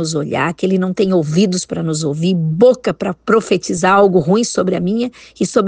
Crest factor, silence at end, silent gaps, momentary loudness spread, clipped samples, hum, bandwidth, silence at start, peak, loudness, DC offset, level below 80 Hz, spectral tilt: 14 dB; 0 s; none; 8 LU; under 0.1%; none; 9.8 kHz; 0 s; 0 dBFS; -15 LUFS; under 0.1%; -52 dBFS; -5.5 dB/octave